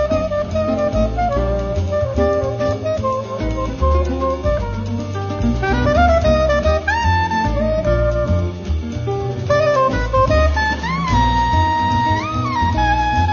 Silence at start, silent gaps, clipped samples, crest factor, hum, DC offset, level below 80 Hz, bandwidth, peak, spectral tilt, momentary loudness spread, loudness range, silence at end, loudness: 0 s; none; under 0.1%; 14 dB; none; under 0.1%; -24 dBFS; 7.2 kHz; -2 dBFS; -6.5 dB/octave; 7 LU; 3 LU; 0 s; -18 LUFS